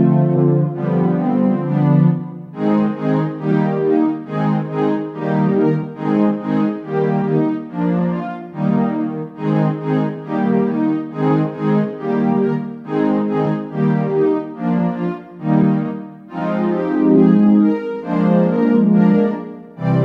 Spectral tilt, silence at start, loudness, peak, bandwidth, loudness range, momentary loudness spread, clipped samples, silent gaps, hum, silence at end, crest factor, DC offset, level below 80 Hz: -11 dB/octave; 0 s; -17 LUFS; -2 dBFS; 5.2 kHz; 4 LU; 9 LU; under 0.1%; none; none; 0 s; 16 dB; under 0.1%; -58 dBFS